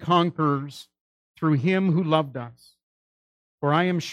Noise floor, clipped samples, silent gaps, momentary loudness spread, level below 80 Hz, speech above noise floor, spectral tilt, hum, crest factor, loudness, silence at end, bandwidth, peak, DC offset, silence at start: under -90 dBFS; under 0.1%; 1.01-1.34 s, 2.83-3.58 s; 16 LU; -70 dBFS; over 67 dB; -7 dB/octave; none; 18 dB; -23 LUFS; 0 s; 11.5 kHz; -6 dBFS; under 0.1%; 0 s